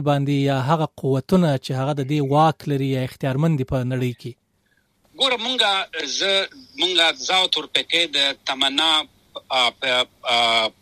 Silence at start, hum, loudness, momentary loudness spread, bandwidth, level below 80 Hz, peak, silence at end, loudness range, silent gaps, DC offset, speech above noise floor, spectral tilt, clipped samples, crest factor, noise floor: 0 s; none; -20 LUFS; 8 LU; 15 kHz; -54 dBFS; -2 dBFS; 0.1 s; 4 LU; none; under 0.1%; 44 dB; -4.5 dB/octave; under 0.1%; 18 dB; -65 dBFS